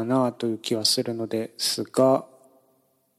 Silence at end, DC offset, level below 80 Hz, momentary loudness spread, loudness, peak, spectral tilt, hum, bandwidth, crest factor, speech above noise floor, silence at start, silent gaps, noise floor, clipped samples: 0.95 s; under 0.1%; -80 dBFS; 8 LU; -24 LUFS; -8 dBFS; -4 dB/octave; none; 15.5 kHz; 18 dB; 42 dB; 0 s; none; -67 dBFS; under 0.1%